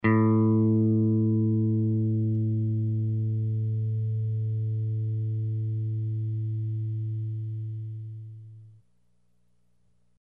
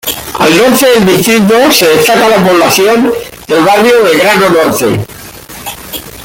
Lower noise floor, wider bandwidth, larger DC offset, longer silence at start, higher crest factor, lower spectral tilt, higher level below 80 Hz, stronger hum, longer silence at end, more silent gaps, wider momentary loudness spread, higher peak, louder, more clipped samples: first, -71 dBFS vs -27 dBFS; second, 2.9 kHz vs 17.5 kHz; neither; about the same, 0.05 s vs 0.05 s; first, 16 dB vs 8 dB; first, -13 dB/octave vs -4 dB/octave; second, -68 dBFS vs -40 dBFS; first, 60 Hz at -70 dBFS vs none; first, 1.6 s vs 0 s; neither; second, 12 LU vs 16 LU; second, -12 dBFS vs 0 dBFS; second, -27 LUFS vs -6 LUFS; neither